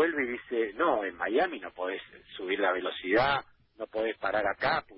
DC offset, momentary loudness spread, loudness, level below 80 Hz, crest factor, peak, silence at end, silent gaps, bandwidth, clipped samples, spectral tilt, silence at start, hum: under 0.1%; 10 LU; -30 LUFS; -62 dBFS; 18 dB; -12 dBFS; 0 s; none; 5.8 kHz; under 0.1%; -8.5 dB/octave; 0 s; none